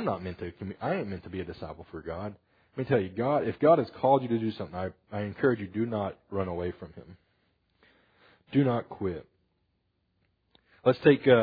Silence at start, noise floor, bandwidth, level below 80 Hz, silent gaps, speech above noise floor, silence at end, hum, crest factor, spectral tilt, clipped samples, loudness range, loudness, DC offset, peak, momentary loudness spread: 0 s; -75 dBFS; 5 kHz; -62 dBFS; none; 47 dB; 0 s; none; 22 dB; -10 dB/octave; under 0.1%; 7 LU; -29 LUFS; under 0.1%; -8 dBFS; 16 LU